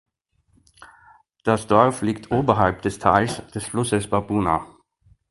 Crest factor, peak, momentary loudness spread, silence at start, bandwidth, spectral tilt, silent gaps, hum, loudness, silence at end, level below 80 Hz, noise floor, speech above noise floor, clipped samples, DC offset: 22 dB; 0 dBFS; 9 LU; 0.8 s; 11.5 kHz; -6 dB/octave; none; none; -21 LUFS; 0.65 s; -46 dBFS; -65 dBFS; 45 dB; under 0.1%; under 0.1%